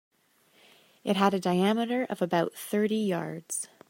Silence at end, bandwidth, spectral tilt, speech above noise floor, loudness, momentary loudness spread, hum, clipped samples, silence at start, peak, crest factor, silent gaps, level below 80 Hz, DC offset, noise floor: 0.25 s; 16.5 kHz; -5 dB/octave; 38 dB; -28 LUFS; 9 LU; none; under 0.1%; 1.05 s; -8 dBFS; 20 dB; none; -78 dBFS; under 0.1%; -65 dBFS